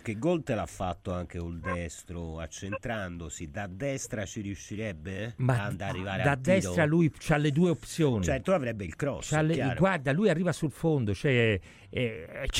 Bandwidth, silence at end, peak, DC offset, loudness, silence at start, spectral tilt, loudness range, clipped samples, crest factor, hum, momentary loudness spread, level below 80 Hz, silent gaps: 15 kHz; 0 s; -12 dBFS; under 0.1%; -30 LUFS; 0.05 s; -6 dB/octave; 9 LU; under 0.1%; 18 dB; none; 12 LU; -48 dBFS; none